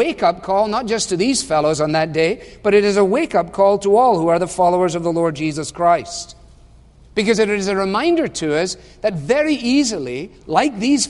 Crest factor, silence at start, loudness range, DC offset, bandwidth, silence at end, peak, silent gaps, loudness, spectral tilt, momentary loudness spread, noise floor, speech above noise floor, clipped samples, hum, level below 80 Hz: 16 dB; 0 s; 4 LU; under 0.1%; 11.5 kHz; 0 s; -2 dBFS; none; -17 LUFS; -4.5 dB/octave; 9 LU; -46 dBFS; 29 dB; under 0.1%; none; -46 dBFS